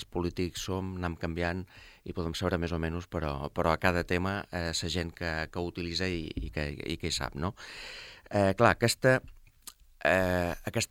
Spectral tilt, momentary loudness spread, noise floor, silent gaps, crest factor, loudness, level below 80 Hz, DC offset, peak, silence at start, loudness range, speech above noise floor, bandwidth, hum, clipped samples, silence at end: -5 dB/octave; 16 LU; -53 dBFS; none; 24 dB; -31 LUFS; -48 dBFS; under 0.1%; -8 dBFS; 0 s; 5 LU; 22 dB; 16.5 kHz; none; under 0.1%; 0.05 s